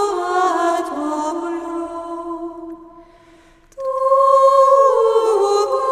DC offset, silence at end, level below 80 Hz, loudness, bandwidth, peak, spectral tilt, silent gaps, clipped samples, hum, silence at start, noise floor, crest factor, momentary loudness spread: under 0.1%; 0 s; -56 dBFS; -16 LUFS; 13 kHz; -2 dBFS; -3 dB/octave; none; under 0.1%; none; 0 s; -48 dBFS; 14 dB; 17 LU